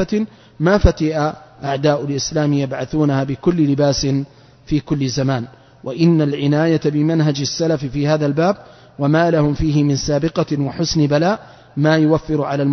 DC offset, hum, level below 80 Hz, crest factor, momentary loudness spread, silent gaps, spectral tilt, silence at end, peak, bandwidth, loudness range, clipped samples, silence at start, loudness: under 0.1%; none; -34 dBFS; 16 dB; 8 LU; none; -6.5 dB/octave; 0 s; 0 dBFS; 6.4 kHz; 1 LU; under 0.1%; 0 s; -17 LUFS